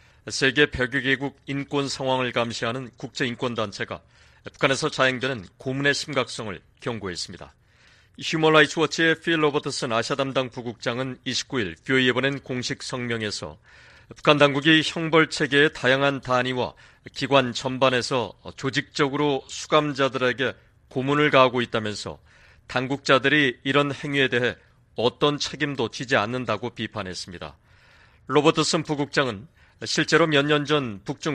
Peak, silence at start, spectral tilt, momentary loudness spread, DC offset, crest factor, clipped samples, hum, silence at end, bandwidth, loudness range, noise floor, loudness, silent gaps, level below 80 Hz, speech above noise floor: -2 dBFS; 0.25 s; -4.5 dB/octave; 14 LU; under 0.1%; 22 dB; under 0.1%; none; 0 s; 11 kHz; 5 LU; -56 dBFS; -23 LUFS; none; -56 dBFS; 33 dB